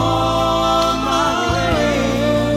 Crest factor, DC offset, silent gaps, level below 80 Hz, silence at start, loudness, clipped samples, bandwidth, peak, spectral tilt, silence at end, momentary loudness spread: 12 dB; under 0.1%; none; -32 dBFS; 0 s; -16 LUFS; under 0.1%; 16.5 kHz; -4 dBFS; -5 dB/octave; 0 s; 1 LU